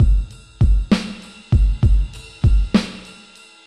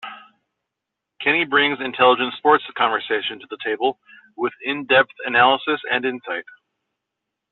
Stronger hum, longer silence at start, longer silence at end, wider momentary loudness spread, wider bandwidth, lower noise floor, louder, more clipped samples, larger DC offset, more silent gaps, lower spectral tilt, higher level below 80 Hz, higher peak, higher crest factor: neither; about the same, 0 s vs 0.05 s; second, 0.65 s vs 1.1 s; first, 17 LU vs 12 LU; first, 10 kHz vs 4.3 kHz; second, -45 dBFS vs -82 dBFS; about the same, -19 LUFS vs -19 LUFS; neither; neither; neither; first, -7 dB/octave vs 0 dB/octave; first, -20 dBFS vs -64 dBFS; about the same, -4 dBFS vs -2 dBFS; about the same, 14 dB vs 18 dB